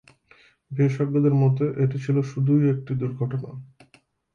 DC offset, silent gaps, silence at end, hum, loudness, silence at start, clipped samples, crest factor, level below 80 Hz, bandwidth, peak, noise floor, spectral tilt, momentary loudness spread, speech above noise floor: under 0.1%; none; 0.7 s; none; -23 LUFS; 0.7 s; under 0.1%; 14 dB; -62 dBFS; 6.8 kHz; -10 dBFS; -60 dBFS; -10 dB/octave; 12 LU; 38 dB